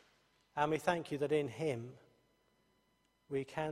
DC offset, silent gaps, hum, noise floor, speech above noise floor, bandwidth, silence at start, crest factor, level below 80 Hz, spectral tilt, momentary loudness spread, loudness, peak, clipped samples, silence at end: under 0.1%; none; none; -77 dBFS; 40 dB; 15 kHz; 0.55 s; 22 dB; -74 dBFS; -6 dB/octave; 10 LU; -38 LUFS; -16 dBFS; under 0.1%; 0 s